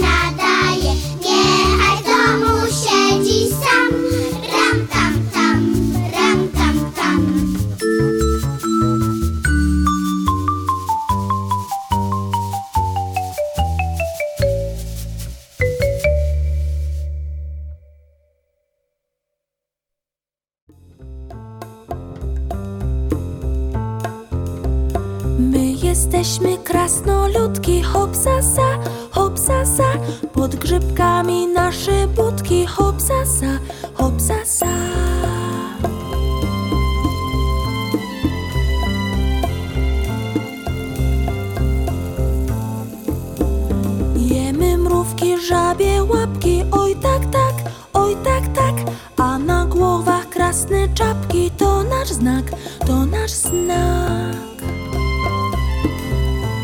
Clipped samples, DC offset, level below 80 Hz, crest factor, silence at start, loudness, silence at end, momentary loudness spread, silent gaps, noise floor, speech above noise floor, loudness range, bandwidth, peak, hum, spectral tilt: under 0.1%; under 0.1%; -24 dBFS; 14 dB; 0 s; -18 LUFS; 0 s; 9 LU; 20.62-20.67 s; under -90 dBFS; over 74 dB; 7 LU; 19 kHz; -2 dBFS; none; -5 dB/octave